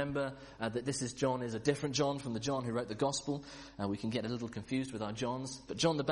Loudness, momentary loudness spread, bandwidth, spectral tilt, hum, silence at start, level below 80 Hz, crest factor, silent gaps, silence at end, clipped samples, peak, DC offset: -36 LUFS; 8 LU; 11.5 kHz; -5 dB/octave; none; 0 s; -62 dBFS; 20 dB; none; 0 s; under 0.1%; -16 dBFS; under 0.1%